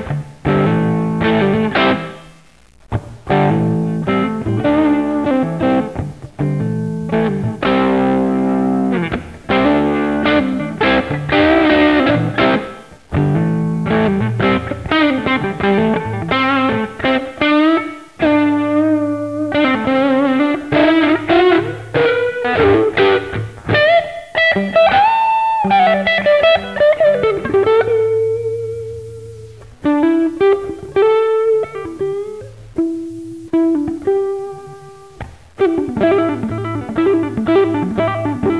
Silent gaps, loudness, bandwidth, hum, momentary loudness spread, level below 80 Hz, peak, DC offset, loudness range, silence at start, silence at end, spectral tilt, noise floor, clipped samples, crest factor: none; -15 LUFS; 11 kHz; none; 11 LU; -40 dBFS; 0 dBFS; 0.3%; 5 LU; 0 s; 0 s; -7.5 dB/octave; -47 dBFS; under 0.1%; 14 dB